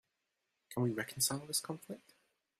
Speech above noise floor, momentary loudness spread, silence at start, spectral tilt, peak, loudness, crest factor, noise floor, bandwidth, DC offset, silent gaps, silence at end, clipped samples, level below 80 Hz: 47 dB; 15 LU; 0.7 s; -3.5 dB/octave; -18 dBFS; -37 LUFS; 22 dB; -86 dBFS; 16 kHz; under 0.1%; none; 0.6 s; under 0.1%; -76 dBFS